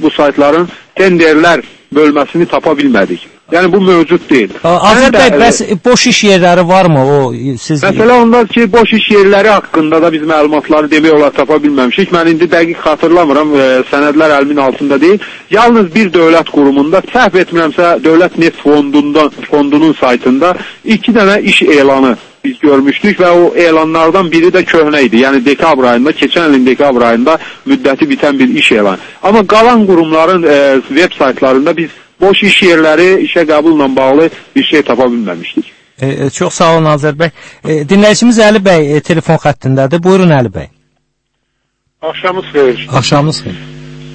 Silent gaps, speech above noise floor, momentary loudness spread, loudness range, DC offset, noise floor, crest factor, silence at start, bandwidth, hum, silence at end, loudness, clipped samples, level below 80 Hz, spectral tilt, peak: none; 57 dB; 8 LU; 3 LU; under 0.1%; -64 dBFS; 8 dB; 0 s; 11 kHz; none; 0 s; -8 LUFS; 2%; -42 dBFS; -5 dB/octave; 0 dBFS